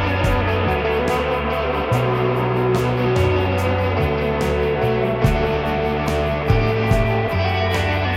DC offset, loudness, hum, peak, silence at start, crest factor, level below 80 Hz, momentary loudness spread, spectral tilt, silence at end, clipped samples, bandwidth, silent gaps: under 0.1%; -19 LUFS; none; -4 dBFS; 0 s; 16 dB; -30 dBFS; 2 LU; -7 dB/octave; 0 s; under 0.1%; 16 kHz; none